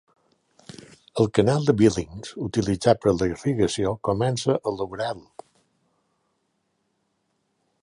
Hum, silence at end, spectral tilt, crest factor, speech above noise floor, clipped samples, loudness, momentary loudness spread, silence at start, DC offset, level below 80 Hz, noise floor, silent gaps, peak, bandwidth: none; 2.65 s; -6 dB/octave; 22 dB; 50 dB; under 0.1%; -23 LUFS; 14 LU; 1.15 s; under 0.1%; -50 dBFS; -73 dBFS; none; -4 dBFS; 11.5 kHz